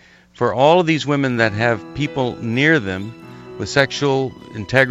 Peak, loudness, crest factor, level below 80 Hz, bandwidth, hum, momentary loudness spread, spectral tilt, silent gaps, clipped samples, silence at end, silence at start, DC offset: 0 dBFS; -18 LUFS; 18 dB; -50 dBFS; 12 kHz; none; 15 LU; -5.5 dB/octave; none; under 0.1%; 0 s; 0.4 s; under 0.1%